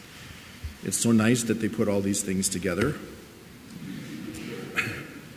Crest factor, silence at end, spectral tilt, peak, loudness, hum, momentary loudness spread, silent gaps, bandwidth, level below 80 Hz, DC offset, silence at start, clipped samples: 20 dB; 0 s; -4.5 dB/octave; -8 dBFS; -27 LUFS; none; 21 LU; none; 16 kHz; -50 dBFS; under 0.1%; 0 s; under 0.1%